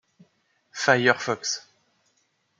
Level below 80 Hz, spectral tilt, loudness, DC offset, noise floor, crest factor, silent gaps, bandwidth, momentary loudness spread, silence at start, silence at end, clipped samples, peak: -76 dBFS; -3 dB/octave; -23 LUFS; under 0.1%; -70 dBFS; 26 dB; none; 9.4 kHz; 13 LU; 0.75 s; 1 s; under 0.1%; -2 dBFS